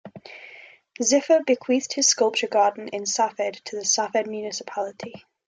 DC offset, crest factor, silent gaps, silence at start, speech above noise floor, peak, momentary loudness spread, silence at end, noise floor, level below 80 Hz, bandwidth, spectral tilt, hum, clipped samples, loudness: under 0.1%; 18 dB; none; 0.05 s; 24 dB; -6 dBFS; 21 LU; 0.3 s; -48 dBFS; -76 dBFS; 10.5 kHz; -1.5 dB/octave; none; under 0.1%; -23 LUFS